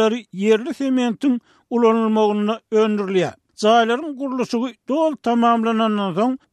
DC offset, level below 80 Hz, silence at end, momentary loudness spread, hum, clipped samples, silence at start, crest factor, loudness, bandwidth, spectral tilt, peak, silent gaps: under 0.1%; -70 dBFS; 0.15 s; 7 LU; none; under 0.1%; 0 s; 16 dB; -19 LUFS; 11 kHz; -6 dB/octave; -4 dBFS; none